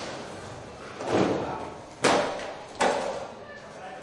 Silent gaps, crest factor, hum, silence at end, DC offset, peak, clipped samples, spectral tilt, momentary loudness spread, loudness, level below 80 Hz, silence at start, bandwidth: none; 22 dB; none; 0 s; under 0.1%; -8 dBFS; under 0.1%; -4 dB/octave; 17 LU; -28 LUFS; -60 dBFS; 0 s; 11.5 kHz